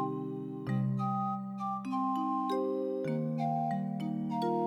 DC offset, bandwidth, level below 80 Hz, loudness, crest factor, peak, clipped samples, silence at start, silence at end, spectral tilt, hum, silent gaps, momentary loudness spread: under 0.1%; 12.5 kHz; -80 dBFS; -34 LUFS; 12 dB; -22 dBFS; under 0.1%; 0 s; 0 s; -9 dB/octave; none; none; 5 LU